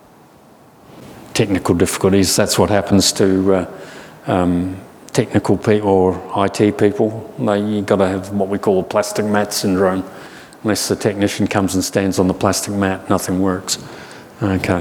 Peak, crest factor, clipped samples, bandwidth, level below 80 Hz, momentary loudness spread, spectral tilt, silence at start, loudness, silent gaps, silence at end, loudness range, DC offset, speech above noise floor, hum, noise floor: 0 dBFS; 16 dB; under 0.1%; 19.5 kHz; -46 dBFS; 10 LU; -5 dB/octave; 0.95 s; -17 LUFS; none; 0 s; 3 LU; under 0.1%; 30 dB; none; -46 dBFS